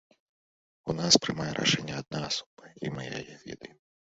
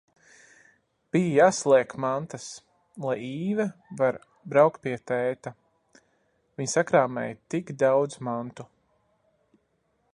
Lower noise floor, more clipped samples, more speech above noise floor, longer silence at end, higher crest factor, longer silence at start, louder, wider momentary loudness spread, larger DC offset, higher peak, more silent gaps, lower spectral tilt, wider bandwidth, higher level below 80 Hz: first, under -90 dBFS vs -72 dBFS; neither; first, over 60 dB vs 47 dB; second, 0.5 s vs 1.5 s; first, 26 dB vs 20 dB; second, 0.85 s vs 1.15 s; about the same, -28 LUFS vs -26 LUFS; first, 21 LU vs 18 LU; neither; about the same, -6 dBFS vs -6 dBFS; first, 2.46-2.57 s vs none; second, -3 dB/octave vs -5.5 dB/octave; second, 8 kHz vs 11.5 kHz; first, -62 dBFS vs -70 dBFS